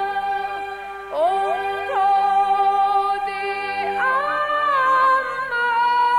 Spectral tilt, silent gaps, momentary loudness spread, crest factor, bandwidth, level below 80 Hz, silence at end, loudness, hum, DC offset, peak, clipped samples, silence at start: -3 dB/octave; none; 8 LU; 10 dB; 12 kHz; -56 dBFS; 0 s; -20 LUFS; 50 Hz at -55 dBFS; under 0.1%; -8 dBFS; under 0.1%; 0 s